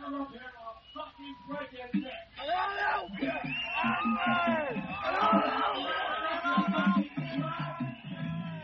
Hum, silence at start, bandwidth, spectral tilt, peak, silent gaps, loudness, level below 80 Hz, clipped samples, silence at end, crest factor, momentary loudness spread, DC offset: none; 0 s; 6.4 kHz; -3.5 dB/octave; -14 dBFS; none; -31 LUFS; -62 dBFS; under 0.1%; 0 s; 18 dB; 16 LU; under 0.1%